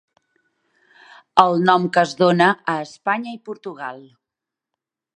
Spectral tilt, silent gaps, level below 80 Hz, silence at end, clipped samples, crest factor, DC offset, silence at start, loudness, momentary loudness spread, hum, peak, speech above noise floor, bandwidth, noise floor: -5.5 dB/octave; none; -68 dBFS; 1.15 s; under 0.1%; 22 dB; under 0.1%; 1.35 s; -18 LUFS; 17 LU; none; 0 dBFS; 67 dB; 10.5 kHz; -86 dBFS